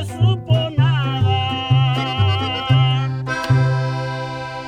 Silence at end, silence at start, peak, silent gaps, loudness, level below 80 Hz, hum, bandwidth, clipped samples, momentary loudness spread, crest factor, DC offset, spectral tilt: 0 s; 0 s; -4 dBFS; none; -18 LUFS; -44 dBFS; none; 9.2 kHz; under 0.1%; 7 LU; 14 dB; under 0.1%; -6.5 dB/octave